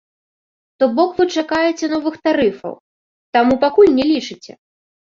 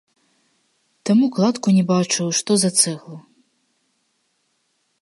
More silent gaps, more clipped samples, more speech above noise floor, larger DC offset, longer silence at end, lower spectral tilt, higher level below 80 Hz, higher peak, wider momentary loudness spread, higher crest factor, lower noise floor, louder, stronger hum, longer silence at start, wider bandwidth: first, 2.80-3.33 s vs none; neither; first, over 75 dB vs 51 dB; neither; second, 0.65 s vs 1.85 s; about the same, -4.5 dB/octave vs -4.5 dB/octave; first, -54 dBFS vs -70 dBFS; about the same, -2 dBFS vs 0 dBFS; first, 14 LU vs 11 LU; second, 16 dB vs 22 dB; first, under -90 dBFS vs -69 dBFS; about the same, -16 LUFS vs -18 LUFS; neither; second, 0.8 s vs 1.05 s; second, 7.6 kHz vs 11.5 kHz